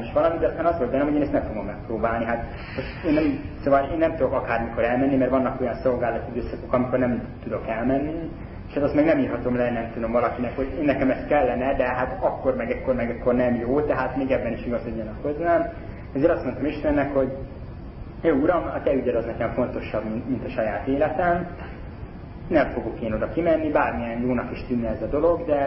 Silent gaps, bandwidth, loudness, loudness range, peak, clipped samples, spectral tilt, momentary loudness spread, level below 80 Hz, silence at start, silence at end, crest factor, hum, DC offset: none; 5.8 kHz; -24 LUFS; 2 LU; -6 dBFS; under 0.1%; -12 dB/octave; 10 LU; -40 dBFS; 0 s; 0 s; 16 dB; none; under 0.1%